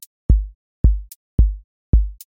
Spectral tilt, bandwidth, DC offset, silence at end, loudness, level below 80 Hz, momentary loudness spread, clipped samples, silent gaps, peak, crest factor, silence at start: -9 dB/octave; 16 kHz; under 0.1%; 0.25 s; -21 LUFS; -20 dBFS; 9 LU; under 0.1%; 0.55-0.84 s, 1.16-1.38 s, 1.64-1.93 s; -2 dBFS; 16 dB; 0.3 s